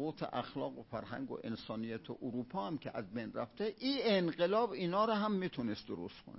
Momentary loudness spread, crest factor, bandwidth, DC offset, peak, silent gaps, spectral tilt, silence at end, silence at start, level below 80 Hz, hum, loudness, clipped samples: 11 LU; 18 dB; 5.8 kHz; under 0.1%; -20 dBFS; none; -9 dB/octave; 0 s; 0 s; -70 dBFS; none; -38 LUFS; under 0.1%